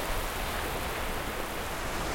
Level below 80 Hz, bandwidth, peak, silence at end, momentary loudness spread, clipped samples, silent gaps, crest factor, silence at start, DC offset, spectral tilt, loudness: -38 dBFS; 16.5 kHz; -20 dBFS; 0 s; 2 LU; under 0.1%; none; 12 dB; 0 s; under 0.1%; -3.5 dB/octave; -33 LUFS